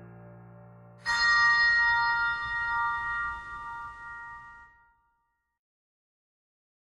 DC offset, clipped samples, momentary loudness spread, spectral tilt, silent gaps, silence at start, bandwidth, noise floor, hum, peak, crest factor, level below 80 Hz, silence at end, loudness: under 0.1%; under 0.1%; 21 LU; -1 dB/octave; none; 0 s; 11.5 kHz; -78 dBFS; none; -14 dBFS; 16 dB; -56 dBFS; 2.25 s; -25 LUFS